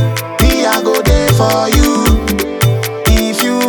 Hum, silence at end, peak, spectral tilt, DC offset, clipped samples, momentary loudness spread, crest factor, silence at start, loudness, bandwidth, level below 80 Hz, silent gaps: none; 0 s; 0 dBFS; -5 dB/octave; under 0.1%; under 0.1%; 3 LU; 12 dB; 0 s; -12 LUFS; 19 kHz; -18 dBFS; none